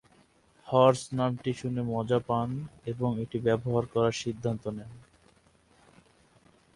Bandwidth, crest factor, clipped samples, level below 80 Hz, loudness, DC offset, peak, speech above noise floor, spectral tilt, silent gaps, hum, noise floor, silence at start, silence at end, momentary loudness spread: 11.5 kHz; 22 dB; under 0.1%; -60 dBFS; -29 LUFS; under 0.1%; -8 dBFS; 35 dB; -6.5 dB/octave; none; none; -63 dBFS; 0.65 s; 1.75 s; 13 LU